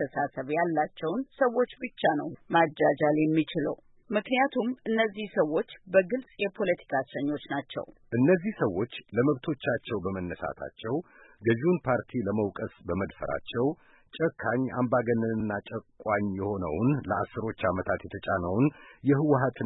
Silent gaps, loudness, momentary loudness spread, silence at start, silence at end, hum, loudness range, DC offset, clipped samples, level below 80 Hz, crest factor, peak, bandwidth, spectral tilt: none; -29 LUFS; 9 LU; 0 s; 0 s; none; 3 LU; under 0.1%; under 0.1%; -58 dBFS; 18 dB; -10 dBFS; 4.1 kHz; -11 dB/octave